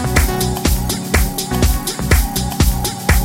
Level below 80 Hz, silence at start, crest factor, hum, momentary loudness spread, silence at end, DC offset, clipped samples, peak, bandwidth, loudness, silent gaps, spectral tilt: -18 dBFS; 0 s; 16 dB; none; 3 LU; 0 s; under 0.1%; under 0.1%; 0 dBFS; 17 kHz; -17 LUFS; none; -4.5 dB/octave